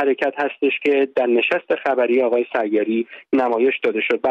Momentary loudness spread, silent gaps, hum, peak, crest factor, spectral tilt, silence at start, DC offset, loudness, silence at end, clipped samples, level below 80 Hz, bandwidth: 4 LU; none; none; -6 dBFS; 12 dB; -6 dB/octave; 0 s; under 0.1%; -19 LUFS; 0 s; under 0.1%; -68 dBFS; 6.6 kHz